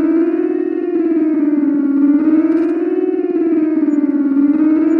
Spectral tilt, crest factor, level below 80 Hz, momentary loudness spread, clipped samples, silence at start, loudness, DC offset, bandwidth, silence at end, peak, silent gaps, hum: -9 dB/octave; 10 dB; -64 dBFS; 4 LU; under 0.1%; 0 s; -15 LUFS; under 0.1%; 3 kHz; 0 s; -4 dBFS; none; none